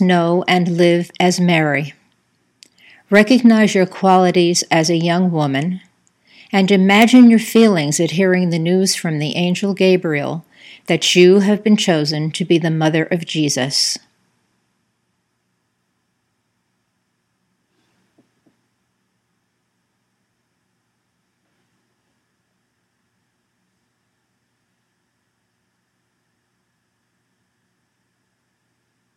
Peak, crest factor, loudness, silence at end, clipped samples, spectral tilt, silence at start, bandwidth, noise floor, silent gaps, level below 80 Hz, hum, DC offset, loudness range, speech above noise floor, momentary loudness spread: 0 dBFS; 18 dB; -14 LUFS; 15.2 s; under 0.1%; -5 dB/octave; 0 s; 16 kHz; -69 dBFS; none; -70 dBFS; none; under 0.1%; 6 LU; 55 dB; 10 LU